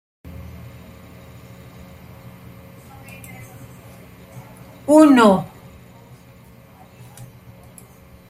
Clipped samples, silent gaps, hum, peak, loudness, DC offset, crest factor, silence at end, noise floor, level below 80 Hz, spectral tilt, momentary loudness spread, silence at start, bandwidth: under 0.1%; none; none; -2 dBFS; -13 LUFS; under 0.1%; 20 dB; 2.85 s; -46 dBFS; -54 dBFS; -6 dB/octave; 30 LU; 0.4 s; 15.5 kHz